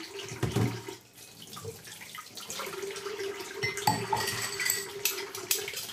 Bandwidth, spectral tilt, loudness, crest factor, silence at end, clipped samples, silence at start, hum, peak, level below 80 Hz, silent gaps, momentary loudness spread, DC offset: 16 kHz; -3 dB/octave; -32 LUFS; 24 dB; 0 s; under 0.1%; 0 s; none; -10 dBFS; -60 dBFS; none; 14 LU; under 0.1%